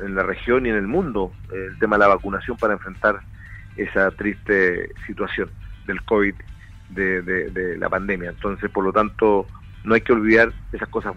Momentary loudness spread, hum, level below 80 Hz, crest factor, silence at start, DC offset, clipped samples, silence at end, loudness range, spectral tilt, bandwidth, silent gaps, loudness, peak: 15 LU; none; -40 dBFS; 20 dB; 0 s; under 0.1%; under 0.1%; 0 s; 4 LU; -7.5 dB/octave; 8.2 kHz; none; -21 LUFS; -2 dBFS